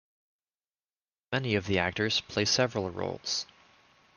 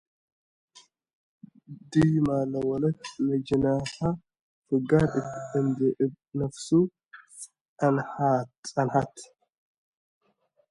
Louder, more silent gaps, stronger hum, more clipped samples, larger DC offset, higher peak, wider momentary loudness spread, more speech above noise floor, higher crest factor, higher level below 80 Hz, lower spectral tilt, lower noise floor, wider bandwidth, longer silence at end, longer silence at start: about the same, -29 LUFS vs -27 LUFS; second, none vs 4.41-4.62 s, 7.61-7.76 s, 8.57-8.63 s; neither; neither; neither; second, -12 dBFS vs -8 dBFS; second, 8 LU vs 13 LU; first, over 60 dB vs 45 dB; about the same, 20 dB vs 20 dB; second, -66 dBFS vs -56 dBFS; second, -3.5 dB/octave vs -7 dB/octave; first, under -90 dBFS vs -70 dBFS; about the same, 11 kHz vs 11.5 kHz; second, 0.75 s vs 1.45 s; second, 1.3 s vs 1.7 s